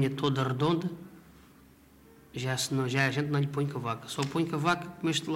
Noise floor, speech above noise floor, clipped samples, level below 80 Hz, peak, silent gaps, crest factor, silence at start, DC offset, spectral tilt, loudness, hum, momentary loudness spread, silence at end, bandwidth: -57 dBFS; 27 dB; under 0.1%; -64 dBFS; -12 dBFS; none; 18 dB; 0 s; under 0.1%; -5 dB/octave; -30 LUFS; none; 9 LU; 0 s; 16 kHz